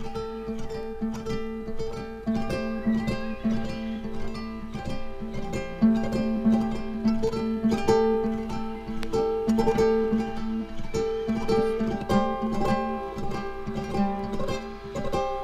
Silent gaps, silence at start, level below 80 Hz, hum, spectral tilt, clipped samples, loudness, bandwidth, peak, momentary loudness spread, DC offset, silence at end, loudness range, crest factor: none; 0 s; -40 dBFS; none; -7 dB/octave; under 0.1%; -28 LUFS; 12.5 kHz; -10 dBFS; 12 LU; under 0.1%; 0 s; 5 LU; 18 dB